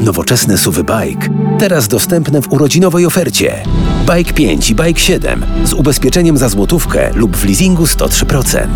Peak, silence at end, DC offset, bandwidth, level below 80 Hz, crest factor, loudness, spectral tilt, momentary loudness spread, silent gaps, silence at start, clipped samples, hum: 0 dBFS; 0 s; under 0.1%; 19.5 kHz; -18 dBFS; 10 dB; -11 LUFS; -4.5 dB/octave; 5 LU; none; 0 s; under 0.1%; none